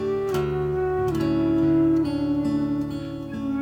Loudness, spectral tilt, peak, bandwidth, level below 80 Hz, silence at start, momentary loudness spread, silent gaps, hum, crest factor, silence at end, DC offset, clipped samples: -24 LUFS; -8 dB/octave; -12 dBFS; 15.5 kHz; -44 dBFS; 0 s; 10 LU; none; none; 12 dB; 0 s; under 0.1%; under 0.1%